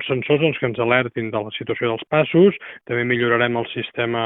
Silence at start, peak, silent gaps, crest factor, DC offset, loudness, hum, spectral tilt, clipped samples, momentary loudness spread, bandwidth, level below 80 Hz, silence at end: 0 s; -2 dBFS; none; 18 dB; under 0.1%; -20 LUFS; none; -10.5 dB/octave; under 0.1%; 10 LU; 4 kHz; -60 dBFS; 0 s